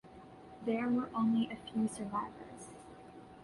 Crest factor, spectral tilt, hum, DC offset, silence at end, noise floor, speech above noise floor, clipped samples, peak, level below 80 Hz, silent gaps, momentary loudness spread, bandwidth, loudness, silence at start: 14 dB; -6 dB/octave; none; under 0.1%; 0 s; -54 dBFS; 20 dB; under 0.1%; -22 dBFS; -68 dBFS; none; 21 LU; 11.5 kHz; -36 LUFS; 0.05 s